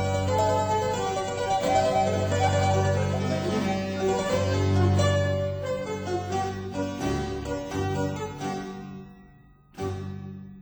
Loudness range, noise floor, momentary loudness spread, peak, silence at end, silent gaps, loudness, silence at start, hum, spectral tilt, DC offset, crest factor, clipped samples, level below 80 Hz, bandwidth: 7 LU; -54 dBFS; 11 LU; -10 dBFS; 0 s; none; -26 LUFS; 0 s; none; -6 dB/octave; under 0.1%; 16 dB; under 0.1%; -48 dBFS; over 20 kHz